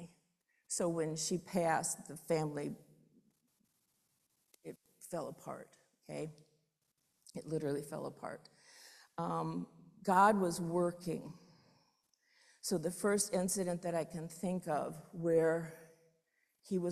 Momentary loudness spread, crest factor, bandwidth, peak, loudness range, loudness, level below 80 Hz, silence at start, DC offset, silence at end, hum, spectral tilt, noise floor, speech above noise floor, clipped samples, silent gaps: 20 LU; 24 dB; 14.5 kHz; -14 dBFS; 14 LU; -37 LUFS; -76 dBFS; 0 s; under 0.1%; 0 s; none; -5 dB/octave; -82 dBFS; 46 dB; under 0.1%; none